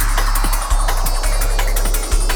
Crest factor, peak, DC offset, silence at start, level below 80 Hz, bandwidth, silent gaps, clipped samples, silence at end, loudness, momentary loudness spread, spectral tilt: 12 dB; -4 dBFS; under 0.1%; 0 s; -16 dBFS; over 20 kHz; none; under 0.1%; 0 s; -19 LUFS; 1 LU; -3 dB/octave